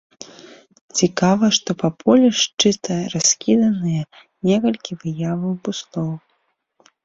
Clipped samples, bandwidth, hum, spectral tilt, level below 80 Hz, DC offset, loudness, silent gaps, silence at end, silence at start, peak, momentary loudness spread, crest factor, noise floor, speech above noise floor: under 0.1%; 7.8 kHz; none; -4 dB/octave; -58 dBFS; under 0.1%; -19 LUFS; 0.81-0.89 s, 2.54-2.58 s; 0.85 s; 0.2 s; -2 dBFS; 13 LU; 18 dB; -68 dBFS; 50 dB